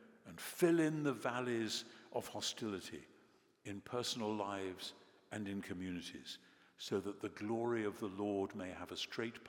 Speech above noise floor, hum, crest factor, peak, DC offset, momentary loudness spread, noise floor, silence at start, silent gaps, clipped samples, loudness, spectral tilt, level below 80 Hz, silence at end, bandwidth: 29 dB; none; 22 dB; -20 dBFS; under 0.1%; 14 LU; -70 dBFS; 0 s; none; under 0.1%; -41 LUFS; -4.5 dB/octave; -84 dBFS; 0 s; 18 kHz